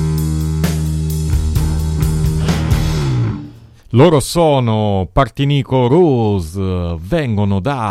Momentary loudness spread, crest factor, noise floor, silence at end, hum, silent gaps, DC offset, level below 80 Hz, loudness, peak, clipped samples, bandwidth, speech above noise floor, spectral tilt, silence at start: 8 LU; 14 dB; -36 dBFS; 0 s; none; none; under 0.1%; -24 dBFS; -15 LUFS; 0 dBFS; under 0.1%; 16.5 kHz; 23 dB; -7 dB/octave; 0 s